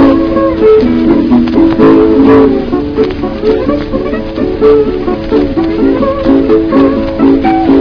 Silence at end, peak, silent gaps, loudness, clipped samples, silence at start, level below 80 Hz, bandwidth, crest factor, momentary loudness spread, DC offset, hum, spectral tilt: 0 s; 0 dBFS; none; -9 LUFS; 2%; 0 s; -26 dBFS; 5.4 kHz; 8 dB; 8 LU; under 0.1%; none; -9 dB/octave